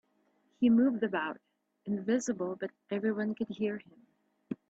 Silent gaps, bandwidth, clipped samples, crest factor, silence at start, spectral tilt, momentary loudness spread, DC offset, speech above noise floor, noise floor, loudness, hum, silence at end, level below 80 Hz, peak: none; 8 kHz; under 0.1%; 16 dB; 0.6 s; -6 dB/octave; 16 LU; under 0.1%; 41 dB; -73 dBFS; -32 LUFS; none; 0.15 s; -76 dBFS; -16 dBFS